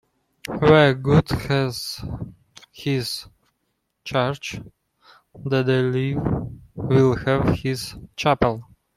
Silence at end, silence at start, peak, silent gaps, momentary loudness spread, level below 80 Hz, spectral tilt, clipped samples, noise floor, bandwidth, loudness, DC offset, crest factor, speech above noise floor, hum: 0.35 s; 0.45 s; -2 dBFS; none; 18 LU; -44 dBFS; -6.5 dB/octave; under 0.1%; -74 dBFS; 15.5 kHz; -21 LUFS; under 0.1%; 20 dB; 53 dB; none